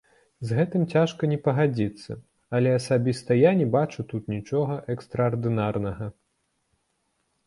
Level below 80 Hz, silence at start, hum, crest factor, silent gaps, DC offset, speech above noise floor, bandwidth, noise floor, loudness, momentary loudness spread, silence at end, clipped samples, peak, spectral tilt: -56 dBFS; 0.4 s; none; 18 dB; none; under 0.1%; 50 dB; 11.5 kHz; -74 dBFS; -25 LUFS; 13 LU; 1.35 s; under 0.1%; -6 dBFS; -7.5 dB/octave